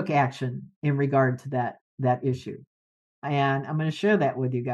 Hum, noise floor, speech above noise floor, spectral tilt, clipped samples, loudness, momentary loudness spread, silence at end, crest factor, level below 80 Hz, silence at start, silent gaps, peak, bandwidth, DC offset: none; under -90 dBFS; over 65 dB; -8 dB/octave; under 0.1%; -26 LUFS; 11 LU; 0 s; 16 dB; -68 dBFS; 0 s; 0.76-0.82 s, 1.81-1.98 s, 2.67-3.22 s; -10 dBFS; 8.8 kHz; under 0.1%